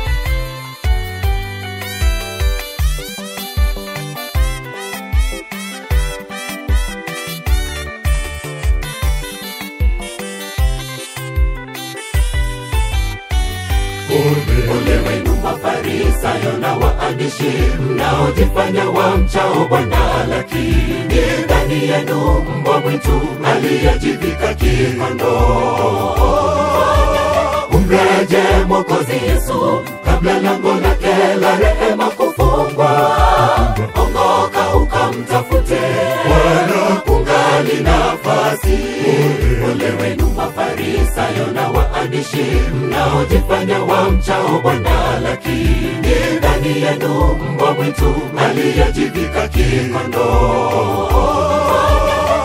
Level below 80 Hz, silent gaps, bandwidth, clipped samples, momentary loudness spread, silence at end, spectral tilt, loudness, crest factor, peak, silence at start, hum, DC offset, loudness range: -20 dBFS; none; 16.5 kHz; under 0.1%; 9 LU; 0 s; -5.5 dB/octave; -15 LUFS; 14 dB; 0 dBFS; 0 s; none; under 0.1%; 7 LU